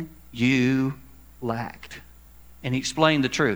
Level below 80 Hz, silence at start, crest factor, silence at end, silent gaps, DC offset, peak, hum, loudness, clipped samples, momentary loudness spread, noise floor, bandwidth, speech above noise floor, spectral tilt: -52 dBFS; 0 s; 22 dB; 0 s; none; 0.2%; -2 dBFS; none; -24 LUFS; under 0.1%; 21 LU; -50 dBFS; over 20 kHz; 27 dB; -5 dB/octave